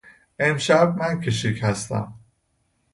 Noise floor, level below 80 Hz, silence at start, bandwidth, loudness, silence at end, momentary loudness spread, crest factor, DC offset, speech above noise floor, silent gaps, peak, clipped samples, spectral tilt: -69 dBFS; -54 dBFS; 0.4 s; 11.5 kHz; -22 LUFS; 0.75 s; 11 LU; 20 dB; under 0.1%; 48 dB; none; -4 dBFS; under 0.1%; -5 dB/octave